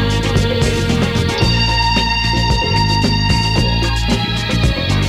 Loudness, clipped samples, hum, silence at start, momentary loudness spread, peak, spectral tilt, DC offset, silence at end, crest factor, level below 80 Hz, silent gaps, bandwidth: -15 LUFS; under 0.1%; none; 0 s; 3 LU; -2 dBFS; -5 dB/octave; under 0.1%; 0 s; 14 dB; -22 dBFS; none; 15 kHz